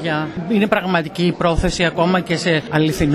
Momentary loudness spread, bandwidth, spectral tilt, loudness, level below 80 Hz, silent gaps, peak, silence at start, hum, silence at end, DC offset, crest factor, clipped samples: 4 LU; 14 kHz; -5.5 dB/octave; -18 LUFS; -32 dBFS; none; 0 dBFS; 0 s; none; 0 s; under 0.1%; 18 dB; under 0.1%